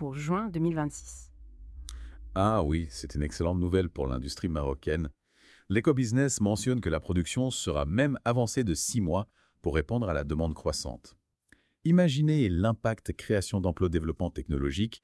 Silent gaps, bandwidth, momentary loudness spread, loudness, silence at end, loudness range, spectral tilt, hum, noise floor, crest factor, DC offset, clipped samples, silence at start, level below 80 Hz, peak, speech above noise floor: none; 12 kHz; 11 LU; -29 LUFS; 0.05 s; 4 LU; -6 dB/octave; none; -66 dBFS; 18 dB; under 0.1%; under 0.1%; 0 s; -44 dBFS; -12 dBFS; 37 dB